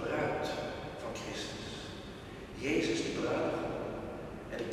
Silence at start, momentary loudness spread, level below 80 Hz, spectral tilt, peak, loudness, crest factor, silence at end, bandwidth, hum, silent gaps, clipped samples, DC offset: 0 s; 12 LU; -56 dBFS; -5 dB/octave; -20 dBFS; -37 LUFS; 16 dB; 0 s; 13.5 kHz; none; none; under 0.1%; under 0.1%